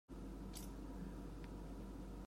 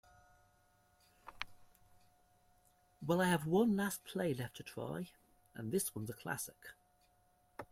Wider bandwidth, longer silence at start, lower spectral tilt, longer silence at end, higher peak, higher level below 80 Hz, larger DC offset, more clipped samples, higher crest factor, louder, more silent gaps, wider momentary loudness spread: about the same, 16 kHz vs 16 kHz; second, 0.1 s vs 1.25 s; about the same, -6 dB/octave vs -5 dB/octave; about the same, 0 s vs 0.05 s; second, -36 dBFS vs -18 dBFS; first, -54 dBFS vs -72 dBFS; neither; neither; second, 14 dB vs 24 dB; second, -52 LUFS vs -39 LUFS; neither; second, 1 LU vs 23 LU